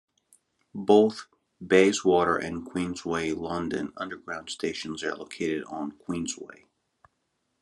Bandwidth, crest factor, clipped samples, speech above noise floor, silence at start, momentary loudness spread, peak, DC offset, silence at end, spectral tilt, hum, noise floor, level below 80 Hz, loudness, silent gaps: 11.5 kHz; 22 dB; under 0.1%; 50 dB; 0.75 s; 16 LU; -4 dBFS; under 0.1%; 1.1 s; -4.5 dB/octave; none; -77 dBFS; -66 dBFS; -27 LUFS; none